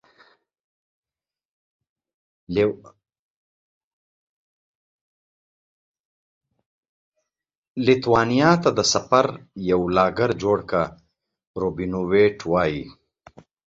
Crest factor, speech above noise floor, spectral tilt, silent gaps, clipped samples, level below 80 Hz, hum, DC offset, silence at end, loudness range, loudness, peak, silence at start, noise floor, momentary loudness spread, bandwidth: 22 dB; over 70 dB; -5 dB/octave; 3.19-5.94 s, 6.00-6.41 s, 6.66-6.83 s, 6.89-7.12 s, 7.57-7.75 s, 11.47-11.54 s; under 0.1%; -52 dBFS; none; under 0.1%; 0.75 s; 11 LU; -21 LUFS; -2 dBFS; 2.5 s; under -90 dBFS; 12 LU; 7.8 kHz